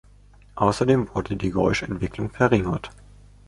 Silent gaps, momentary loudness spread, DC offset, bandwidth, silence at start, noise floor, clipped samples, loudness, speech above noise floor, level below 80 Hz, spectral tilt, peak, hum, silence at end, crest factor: none; 10 LU; under 0.1%; 11.5 kHz; 0.55 s; -51 dBFS; under 0.1%; -23 LUFS; 28 dB; -42 dBFS; -6.5 dB/octave; -4 dBFS; 50 Hz at -40 dBFS; 0.6 s; 20 dB